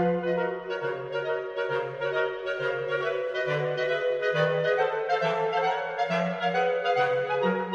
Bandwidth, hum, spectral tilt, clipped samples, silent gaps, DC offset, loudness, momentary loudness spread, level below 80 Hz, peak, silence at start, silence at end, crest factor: 7.4 kHz; none; -6 dB/octave; under 0.1%; none; under 0.1%; -27 LUFS; 5 LU; -68 dBFS; -12 dBFS; 0 s; 0 s; 14 dB